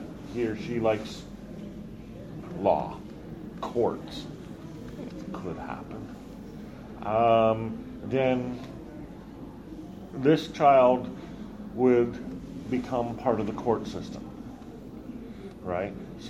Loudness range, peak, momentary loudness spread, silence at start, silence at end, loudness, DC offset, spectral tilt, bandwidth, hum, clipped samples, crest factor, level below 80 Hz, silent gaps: 10 LU; -8 dBFS; 20 LU; 0 s; 0 s; -28 LUFS; under 0.1%; -7 dB/octave; 13.5 kHz; none; under 0.1%; 22 dB; -52 dBFS; none